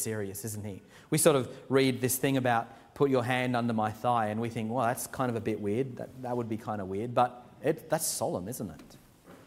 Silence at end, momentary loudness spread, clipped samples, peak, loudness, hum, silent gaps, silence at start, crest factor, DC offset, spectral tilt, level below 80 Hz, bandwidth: 0.1 s; 11 LU; under 0.1%; -10 dBFS; -30 LUFS; none; none; 0 s; 20 dB; under 0.1%; -5 dB/octave; -66 dBFS; 16 kHz